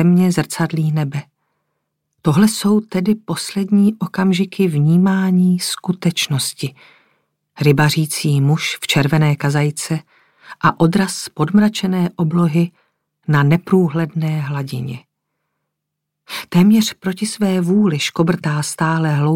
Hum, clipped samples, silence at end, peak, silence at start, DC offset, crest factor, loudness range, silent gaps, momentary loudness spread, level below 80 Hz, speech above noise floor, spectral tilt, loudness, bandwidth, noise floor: none; under 0.1%; 0 s; -2 dBFS; 0 s; under 0.1%; 16 dB; 3 LU; none; 9 LU; -54 dBFS; 62 dB; -6 dB/octave; -16 LUFS; 16.5 kHz; -78 dBFS